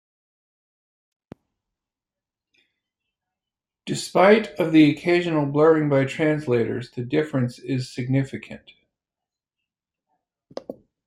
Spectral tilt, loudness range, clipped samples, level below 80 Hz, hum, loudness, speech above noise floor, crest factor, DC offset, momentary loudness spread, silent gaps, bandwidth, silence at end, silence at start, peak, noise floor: -6.5 dB/octave; 12 LU; under 0.1%; -64 dBFS; none; -21 LUFS; 69 dB; 22 dB; under 0.1%; 21 LU; none; 13 kHz; 0.35 s; 3.85 s; -2 dBFS; -89 dBFS